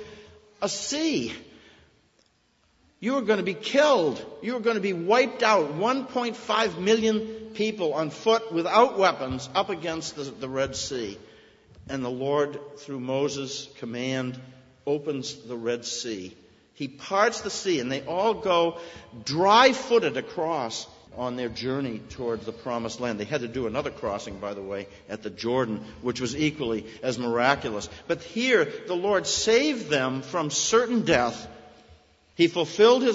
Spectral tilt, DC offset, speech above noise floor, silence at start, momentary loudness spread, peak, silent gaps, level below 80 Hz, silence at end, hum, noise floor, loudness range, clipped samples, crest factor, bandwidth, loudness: -4 dB/octave; under 0.1%; 41 dB; 0 s; 14 LU; -4 dBFS; none; -58 dBFS; 0 s; none; -66 dBFS; 8 LU; under 0.1%; 22 dB; 8 kHz; -26 LUFS